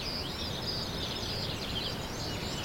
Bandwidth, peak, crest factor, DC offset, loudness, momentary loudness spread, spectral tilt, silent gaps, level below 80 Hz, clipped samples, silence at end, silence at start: 16.5 kHz; -22 dBFS; 14 dB; under 0.1%; -34 LUFS; 2 LU; -4 dB/octave; none; -46 dBFS; under 0.1%; 0 s; 0 s